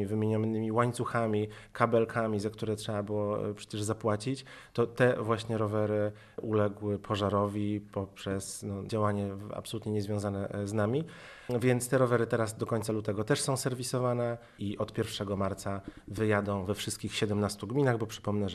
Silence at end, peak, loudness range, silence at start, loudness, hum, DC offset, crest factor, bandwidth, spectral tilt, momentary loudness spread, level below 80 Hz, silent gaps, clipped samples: 0 s; -10 dBFS; 3 LU; 0 s; -32 LUFS; none; under 0.1%; 22 dB; 13.5 kHz; -6 dB/octave; 10 LU; -62 dBFS; none; under 0.1%